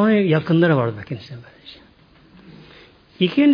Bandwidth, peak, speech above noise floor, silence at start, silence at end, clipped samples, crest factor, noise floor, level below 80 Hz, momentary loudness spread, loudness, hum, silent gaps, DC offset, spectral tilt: 5.2 kHz; -4 dBFS; 33 dB; 0 s; 0 s; under 0.1%; 16 dB; -50 dBFS; -58 dBFS; 25 LU; -18 LUFS; none; none; under 0.1%; -9 dB/octave